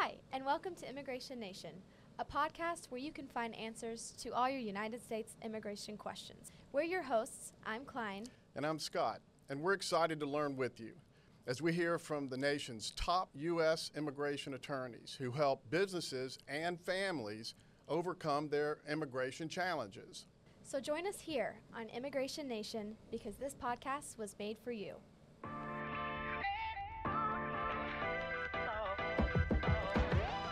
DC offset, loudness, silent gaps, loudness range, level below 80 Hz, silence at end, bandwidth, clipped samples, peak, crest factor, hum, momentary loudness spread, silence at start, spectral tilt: under 0.1%; -40 LUFS; none; 5 LU; -54 dBFS; 0 s; 15.5 kHz; under 0.1%; -22 dBFS; 18 dB; none; 12 LU; 0 s; -5 dB/octave